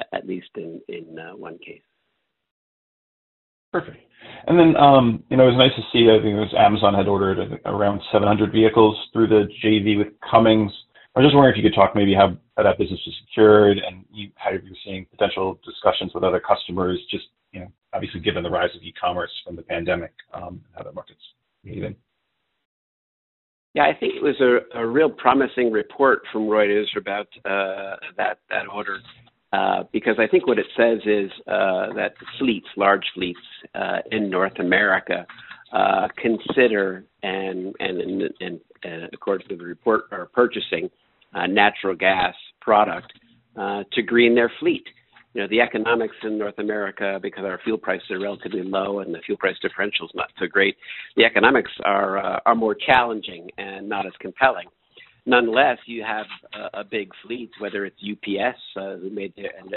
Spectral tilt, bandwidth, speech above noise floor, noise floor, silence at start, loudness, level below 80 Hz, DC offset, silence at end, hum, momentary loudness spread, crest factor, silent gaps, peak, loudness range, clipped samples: -3.5 dB/octave; 4.2 kHz; 54 dB; -75 dBFS; 0 s; -20 LUFS; -54 dBFS; under 0.1%; 0 s; none; 18 LU; 22 dB; 2.51-3.72 s, 22.65-23.74 s; 0 dBFS; 10 LU; under 0.1%